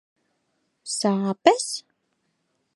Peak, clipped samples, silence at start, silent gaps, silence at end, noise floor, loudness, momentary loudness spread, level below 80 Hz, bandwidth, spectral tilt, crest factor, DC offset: -2 dBFS; under 0.1%; 0.85 s; none; 0.95 s; -73 dBFS; -23 LUFS; 13 LU; -78 dBFS; 11.5 kHz; -4 dB/octave; 26 dB; under 0.1%